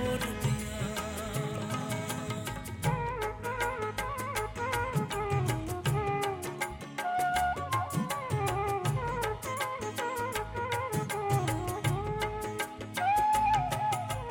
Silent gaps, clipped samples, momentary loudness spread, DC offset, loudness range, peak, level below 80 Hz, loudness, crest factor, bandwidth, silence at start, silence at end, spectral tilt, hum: none; under 0.1%; 6 LU; under 0.1%; 4 LU; -16 dBFS; -48 dBFS; -32 LUFS; 16 dB; 17 kHz; 0 s; 0 s; -5 dB/octave; none